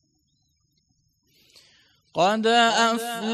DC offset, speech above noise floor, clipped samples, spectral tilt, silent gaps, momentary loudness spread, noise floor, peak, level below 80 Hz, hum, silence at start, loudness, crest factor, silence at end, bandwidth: under 0.1%; 49 dB; under 0.1%; -3 dB/octave; none; 9 LU; -70 dBFS; -8 dBFS; -74 dBFS; none; 2.15 s; -21 LUFS; 18 dB; 0 s; 15 kHz